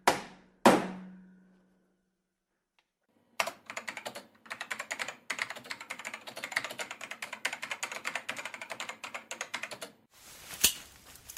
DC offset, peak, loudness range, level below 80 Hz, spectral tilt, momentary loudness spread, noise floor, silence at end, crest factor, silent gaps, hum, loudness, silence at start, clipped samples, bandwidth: under 0.1%; -8 dBFS; 8 LU; -68 dBFS; -2 dB/octave; 18 LU; -83 dBFS; 0 s; 28 dB; none; none; -34 LUFS; 0.05 s; under 0.1%; 16 kHz